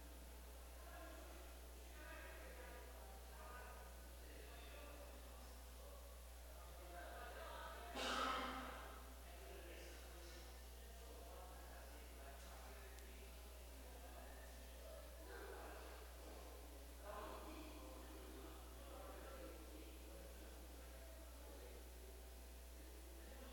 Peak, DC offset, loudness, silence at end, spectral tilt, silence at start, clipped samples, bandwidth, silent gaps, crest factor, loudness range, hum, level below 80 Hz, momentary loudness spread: -32 dBFS; under 0.1%; -56 LUFS; 0 s; -3.5 dB/octave; 0 s; under 0.1%; 17 kHz; none; 22 dB; 8 LU; 60 Hz at -60 dBFS; -58 dBFS; 5 LU